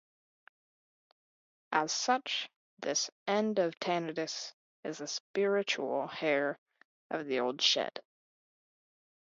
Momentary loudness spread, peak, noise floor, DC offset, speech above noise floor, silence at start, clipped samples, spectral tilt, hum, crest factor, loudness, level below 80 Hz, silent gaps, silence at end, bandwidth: 12 LU; -14 dBFS; under -90 dBFS; under 0.1%; over 57 dB; 1.7 s; under 0.1%; -1.5 dB/octave; none; 22 dB; -33 LUFS; -86 dBFS; 2.56-2.77 s, 3.12-3.26 s, 4.54-4.83 s, 5.20-5.34 s, 6.58-6.66 s, 6.85-7.10 s; 1.25 s; 7.4 kHz